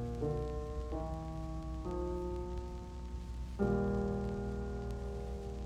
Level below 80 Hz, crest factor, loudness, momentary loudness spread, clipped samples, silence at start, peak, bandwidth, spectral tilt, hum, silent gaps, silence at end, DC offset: -42 dBFS; 18 dB; -40 LUFS; 10 LU; under 0.1%; 0 s; -20 dBFS; 10 kHz; -8.5 dB/octave; none; none; 0 s; under 0.1%